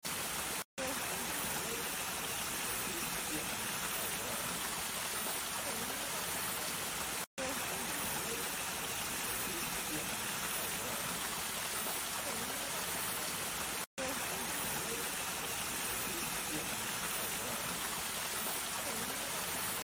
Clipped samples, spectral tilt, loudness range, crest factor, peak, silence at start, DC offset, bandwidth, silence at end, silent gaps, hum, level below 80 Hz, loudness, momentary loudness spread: under 0.1%; -1 dB/octave; 0 LU; 16 dB; -24 dBFS; 0.05 s; under 0.1%; 17 kHz; 0.05 s; 0.65-0.77 s, 7.27-7.37 s, 13.86-13.97 s; none; -62 dBFS; -36 LUFS; 1 LU